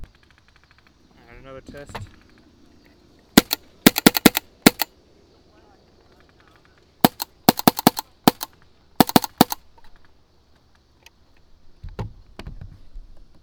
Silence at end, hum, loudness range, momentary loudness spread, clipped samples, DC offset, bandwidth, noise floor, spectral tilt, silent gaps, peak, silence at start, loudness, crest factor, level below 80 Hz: 0.95 s; none; 6 LU; 25 LU; under 0.1%; under 0.1%; over 20 kHz; -57 dBFS; -4 dB/octave; none; 0 dBFS; 0 s; -18 LUFS; 24 dB; -46 dBFS